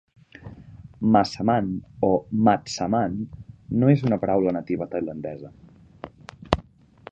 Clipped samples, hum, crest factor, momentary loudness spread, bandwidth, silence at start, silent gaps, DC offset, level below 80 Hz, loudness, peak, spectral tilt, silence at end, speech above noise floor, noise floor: under 0.1%; none; 24 dB; 23 LU; 8.6 kHz; 0.4 s; none; under 0.1%; -48 dBFS; -23 LUFS; 0 dBFS; -7 dB/octave; 0.5 s; 26 dB; -48 dBFS